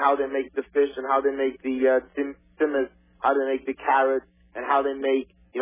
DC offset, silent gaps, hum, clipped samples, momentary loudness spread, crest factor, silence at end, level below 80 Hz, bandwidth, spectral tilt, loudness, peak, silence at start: under 0.1%; none; none; under 0.1%; 10 LU; 18 dB; 0 s; -62 dBFS; 3.8 kHz; -7.5 dB/octave; -25 LUFS; -6 dBFS; 0 s